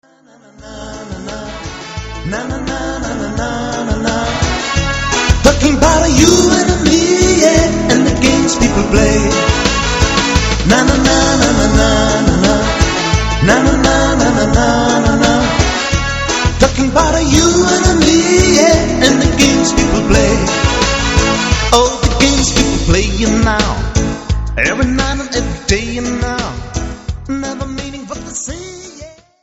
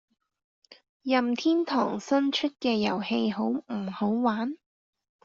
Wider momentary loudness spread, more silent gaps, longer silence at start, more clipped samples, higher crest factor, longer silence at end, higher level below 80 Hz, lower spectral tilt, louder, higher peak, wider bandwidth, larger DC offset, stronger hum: first, 13 LU vs 8 LU; second, none vs 0.89-1.00 s; about the same, 0.6 s vs 0.7 s; first, 0.1% vs under 0.1%; second, 12 dB vs 18 dB; second, 0.3 s vs 0.7 s; first, -20 dBFS vs -72 dBFS; about the same, -4 dB/octave vs -3.5 dB/octave; first, -12 LUFS vs -27 LUFS; first, 0 dBFS vs -10 dBFS; first, 15.5 kHz vs 7.6 kHz; neither; neither